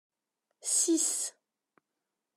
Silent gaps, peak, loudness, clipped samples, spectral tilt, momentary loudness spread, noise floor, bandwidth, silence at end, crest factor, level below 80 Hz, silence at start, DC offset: none; -16 dBFS; -28 LUFS; under 0.1%; 1 dB/octave; 12 LU; -87 dBFS; 14.5 kHz; 1.05 s; 20 dB; under -90 dBFS; 0.65 s; under 0.1%